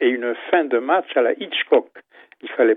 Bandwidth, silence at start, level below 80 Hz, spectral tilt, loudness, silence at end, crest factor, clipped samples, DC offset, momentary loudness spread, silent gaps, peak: 4 kHz; 0 s; -88 dBFS; -7 dB/octave; -20 LUFS; 0 s; 18 dB; under 0.1%; under 0.1%; 6 LU; none; -2 dBFS